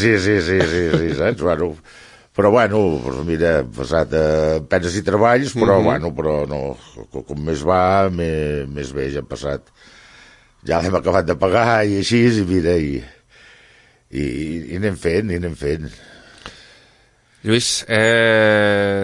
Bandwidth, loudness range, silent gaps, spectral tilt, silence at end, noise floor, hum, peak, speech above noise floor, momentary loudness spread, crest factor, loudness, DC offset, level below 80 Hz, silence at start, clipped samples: 11.5 kHz; 7 LU; none; -5.5 dB/octave; 0 s; -55 dBFS; none; -2 dBFS; 37 dB; 14 LU; 16 dB; -18 LUFS; under 0.1%; -40 dBFS; 0 s; under 0.1%